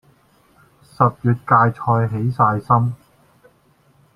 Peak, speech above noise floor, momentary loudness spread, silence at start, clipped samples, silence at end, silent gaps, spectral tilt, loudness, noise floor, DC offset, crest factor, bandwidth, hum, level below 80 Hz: 0 dBFS; 40 dB; 6 LU; 1 s; under 0.1%; 1.2 s; none; -10 dB/octave; -18 LUFS; -57 dBFS; under 0.1%; 20 dB; 5.2 kHz; none; -54 dBFS